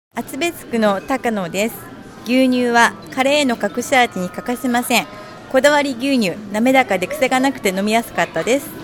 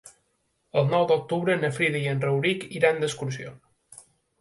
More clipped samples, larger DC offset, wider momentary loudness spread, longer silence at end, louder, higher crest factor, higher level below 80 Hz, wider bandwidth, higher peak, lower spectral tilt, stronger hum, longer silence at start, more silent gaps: neither; neither; about the same, 9 LU vs 10 LU; second, 0 s vs 0.4 s; first, -17 LUFS vs -25 LUFS; about the same, 18 dB vs 20 dB; first, -52 dBFS vs -66 dBFS; first, 18 kHz vs 11.5 kHz; first, 0 dBFS vs -6 dBFS; second, -3.5 dB/octave vs -5.5 dB/octave; neither; about the same, 0.15 s vs 0.05 s; neither